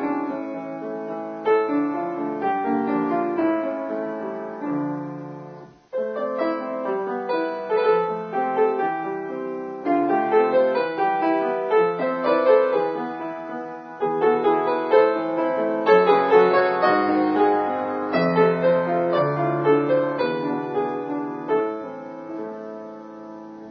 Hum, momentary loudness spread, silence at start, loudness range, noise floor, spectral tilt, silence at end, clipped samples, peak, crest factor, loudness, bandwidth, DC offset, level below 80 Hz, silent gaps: none; 14 LU; 0 s; 9 LU; -42 dBFS; -8.5 dB/octave; 0 s; under 0.1%; -4 dBFS; 18 dB; -22 LUFS; 6 kHz; under 0.1%; -68 dBFS; none